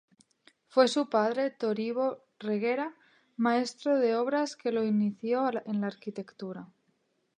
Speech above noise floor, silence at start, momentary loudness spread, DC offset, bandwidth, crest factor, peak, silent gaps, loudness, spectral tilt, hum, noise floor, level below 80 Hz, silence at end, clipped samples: 45 dB; 0.75 s; 14 LU; under 0.1%; 10 kHz; 22 dB; -8 dBFS; none; -29 LUFS; -5.5 dB/octave; none; -74 dBFS; -84 dBFS; 0.7 s; under 0.1%